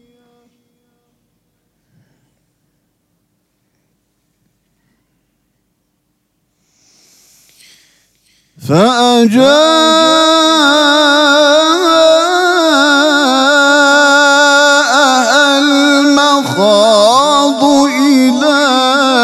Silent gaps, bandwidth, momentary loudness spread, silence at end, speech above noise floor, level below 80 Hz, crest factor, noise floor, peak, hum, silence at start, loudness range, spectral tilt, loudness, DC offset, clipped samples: none; 15 kHz; 3 LU; 0 s; 56 dB; -58 dBFS; 10 dB; -64 dBFS; 0 dBFS; none; 8.6 s; 4 LU; -3 dB/octave; -8 LUFS; under 0.1%; under 0.1%